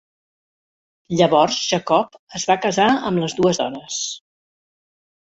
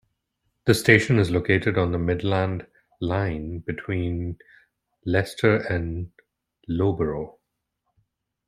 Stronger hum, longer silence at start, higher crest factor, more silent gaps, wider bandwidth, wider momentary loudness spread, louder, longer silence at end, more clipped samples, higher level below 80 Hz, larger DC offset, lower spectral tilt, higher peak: neither; first, 1.1 s vs 0.65 s; about the same, 20 dB vs 22 dB; first, 2.19-2.27 s vs none; second, 8.2 kHz vs 14.5 kHz; second, 10 LU vs 17 LU; first, -19 LUFS vs -23 LUFS; about the same, 1.05 s vs 1.15 s; neither; second, -58 dBFS vs -48 dBFS; neither; second, -4 dB/octave vs -6.5 dB/octave; about the same, -2 dBFS vs -2 dBFS